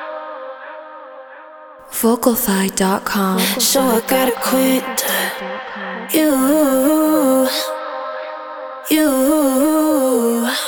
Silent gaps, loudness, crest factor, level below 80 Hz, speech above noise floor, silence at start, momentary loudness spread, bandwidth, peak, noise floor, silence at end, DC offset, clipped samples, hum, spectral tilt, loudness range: none; -16 LUFS; 16 dB; -52 dBFS; 23 dB; 0 s; 16 LU; over 20 kHz; 0 dBFS; -38 dBFS; 0 s; under 0.1%; under 0.1%; none; -3.5 dB/octave; 2 LU